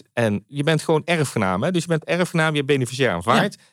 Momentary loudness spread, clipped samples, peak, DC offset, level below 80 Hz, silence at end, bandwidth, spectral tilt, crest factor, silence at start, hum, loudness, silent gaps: 4 LU; under 0.1%; -6 dBFS; under 0.1%; -64 dBFS; 0.2 s; 15.5 kHz; -5.5 dB/octave; 16 dB; 0.15 s; none; -21 LUFS; none